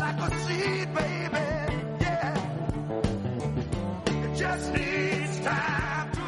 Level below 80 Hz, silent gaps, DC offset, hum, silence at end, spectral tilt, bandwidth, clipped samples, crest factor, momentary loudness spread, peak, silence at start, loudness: -42 dBFS; none; under 0.1%; none; 0 s; -6 dB/octave; 11.5 kHz; under 0.1%; 20 dB; 4 LU; -10 dBFS; 0 s; -29 LUFS